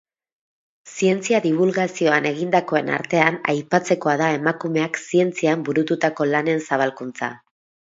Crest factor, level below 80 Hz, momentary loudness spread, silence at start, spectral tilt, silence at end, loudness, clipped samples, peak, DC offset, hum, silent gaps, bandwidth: 20 dB; -70 dBFS; 5 LU; 0.85 s; -5.5 dB/octave; 0.55 s; -20 LUFS; under 0.1%; 0 dBFS; under 0.1%; none; none; 7.8 kHz